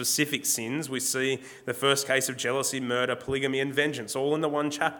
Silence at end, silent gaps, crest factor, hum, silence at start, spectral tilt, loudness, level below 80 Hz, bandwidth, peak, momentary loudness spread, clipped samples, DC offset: 0 s; none; 20 dB; none; 0 s; -2.5 dB/octave; -27 LUFS; -62 dBFS; 19 kHz; -8 dBFS; 4 LU; under 0.1%; under 0.1%